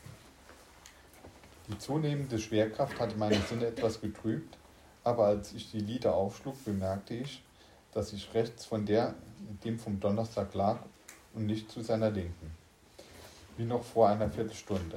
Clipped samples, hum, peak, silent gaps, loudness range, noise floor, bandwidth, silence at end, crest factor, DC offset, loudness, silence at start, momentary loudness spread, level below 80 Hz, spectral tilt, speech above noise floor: under 0.1%; none; -12 dBFS; none; 3 LU; -57 dBFS; 16 kHz; 0 s; 22 dB; under 0.1%; -33 LUFS; 0.05 s; 22 LU; -58 dBFS; -6.5 dB/octave; 24 dB